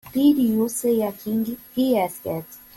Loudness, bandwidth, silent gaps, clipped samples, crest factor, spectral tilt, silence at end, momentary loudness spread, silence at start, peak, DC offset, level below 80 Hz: -22 LUFS; 17 kHz; none; under 0.1%; 14 dB; -5.5 dB/octave; 0.2 s; 11 LU; 0.05 s; -8 dBFS; under 0.1%; -58 dBFS